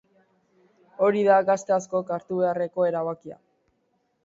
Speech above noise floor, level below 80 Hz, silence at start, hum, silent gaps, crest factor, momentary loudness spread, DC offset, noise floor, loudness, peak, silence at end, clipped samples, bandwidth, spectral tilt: 48 dB; -74 dBFS; 1 s; none; none; 18 dB; 11 LU; under 0.1%; -71 dBFS; -24 LUFS; -8 dBFS; 0.9 s; under 0.1%; 7.8 kHz; -6 dB/octave